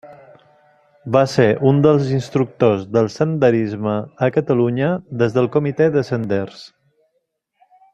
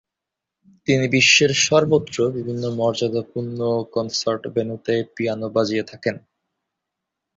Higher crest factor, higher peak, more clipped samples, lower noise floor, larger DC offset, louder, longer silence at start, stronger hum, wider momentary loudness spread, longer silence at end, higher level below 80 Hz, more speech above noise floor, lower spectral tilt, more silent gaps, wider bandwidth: about the same, 16 dB vs 20 dB; about the same, -2 dBFS vs 0 dBFS; neither; second, -70 dBFS vs -85 dBFS; neither; first, -17 LUFS vs -20 LUFS; second, 0.05 s vs 0.9 s; neither; second, 8 LU vs 13 LU; about the same, 1.25 s vs 1.2 s; about the same, -56 dBFS vs -60 dBFS; second, 54 dB vs 64 dB; first, -7.5 dB/octave vs -3.5 dB/octave; neither; first, 9 kHz vs 7.8 kHz